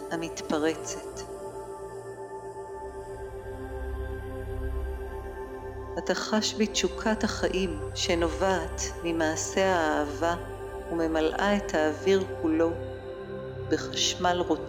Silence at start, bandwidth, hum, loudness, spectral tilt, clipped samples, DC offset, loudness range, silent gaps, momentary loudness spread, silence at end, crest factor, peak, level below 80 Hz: 0 s; 16 kHz; none; -29 LUFS; -4 dB/octave; under 0.1%; under 0.1%; 10 LU; none; 13 LU; 0 s; 18 dB; -12 dBFS; -42 dBFS